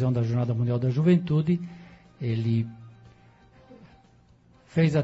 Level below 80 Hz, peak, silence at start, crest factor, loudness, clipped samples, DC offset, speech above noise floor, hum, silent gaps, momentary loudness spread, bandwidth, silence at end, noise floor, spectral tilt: -58 dBFS; -10 dBFS; 0 s; 16 dB; -26 LUFS; under 0.1%; under 0.1%; 34 dB; none; none; 13 LU; 8 kHz; 0 s; -58 dBFS; -9 dB/octave